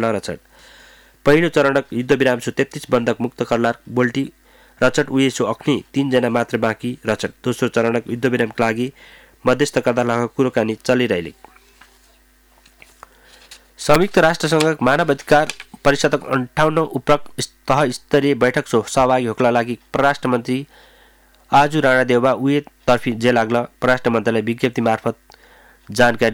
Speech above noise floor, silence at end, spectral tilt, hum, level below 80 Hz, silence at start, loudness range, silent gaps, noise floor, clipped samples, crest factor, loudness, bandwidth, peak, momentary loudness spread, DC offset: 36 dB; 0 s; -5.5 dB/octave; none; -46 dBFS; 0 s; 4 LU; none; -53 dBFS; under 0.1%; 14 dB; -18 LUFS; over 20 kHz; -4 dBFS; 8 LU; under 0.1%